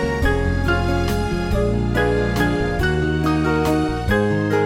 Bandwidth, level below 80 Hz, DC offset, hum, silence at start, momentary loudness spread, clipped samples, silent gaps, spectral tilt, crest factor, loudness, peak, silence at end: 16.5 kHz; -26 dBFS; under 0.1%; none; 0 s; 2 LU; under 0.1%; none; -6.5 dB/octave; 14 dB; -20 LUFS; -6 dBFS; 0 s